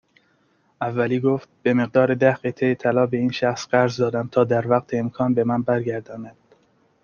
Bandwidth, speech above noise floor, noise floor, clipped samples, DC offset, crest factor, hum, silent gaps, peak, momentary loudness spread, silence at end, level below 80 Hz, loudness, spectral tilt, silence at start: 7.2 kHz; 42 dB; -63 dBFS; under 0.1%; under 0.1%; 18 dB; none; none; -4 dBFS; 8 LU; 0.75 s; -62 dBFS; -21 LUFS; -7 dB/octave; 0.8 s